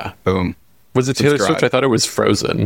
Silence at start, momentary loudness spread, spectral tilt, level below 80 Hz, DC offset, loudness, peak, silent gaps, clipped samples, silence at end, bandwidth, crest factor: 0 s; 6 LU; -4.5 dB/octave; -46 dBFS; 0.2%; -17 LUFS; -2 dBFS; none; under 0.1%; 0 s; 17 kHz; 14 dB